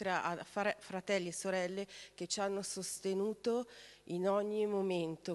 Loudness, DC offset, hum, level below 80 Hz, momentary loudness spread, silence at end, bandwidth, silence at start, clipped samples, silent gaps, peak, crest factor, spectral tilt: -38 LUFS; under 0.1%; 50 Hz at -75 dBFS; -78 dBFS; 9 LU; 0 s; 12.5 kHz; 0 s; under 0.1%; none; -20 dBFS; 16 dB; -4 dB/octave